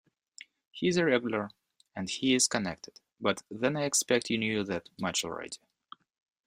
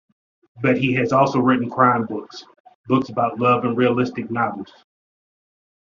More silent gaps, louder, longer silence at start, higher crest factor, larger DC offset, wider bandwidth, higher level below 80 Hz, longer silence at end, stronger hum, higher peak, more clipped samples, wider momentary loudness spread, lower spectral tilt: second, none vs 2.60-2.64 s, 2.75-2.84 s; second, -30 LUFS vs -19 LUFS; first, 0.75 s vs 0.55 s; about the same, 22 dB vs 20 dB; neither; first, 15.5 kHz vs 7.2 kHz; second, -68 dBFS vs -60 dBFS; second, 0.9 s vs 1.25 s; neither; second, -10 dBFS vs -2 dBFS; neither; first, 18 LU vs 14 LU; second, -3 dB/octave vs -5.5 dB/octave